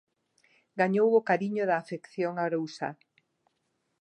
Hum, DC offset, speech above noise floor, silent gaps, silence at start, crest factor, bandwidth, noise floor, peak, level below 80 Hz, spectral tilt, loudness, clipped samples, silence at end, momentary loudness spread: none; under 0.1%; 50 dB; none; 0.75 s; 18 dB; 9.2 kHz; -78 dBFS; -12 dBFS; -84 dBFS; -7 dB/octave; -28 LUFS; under 0.1%; 1.1 s; 14 LU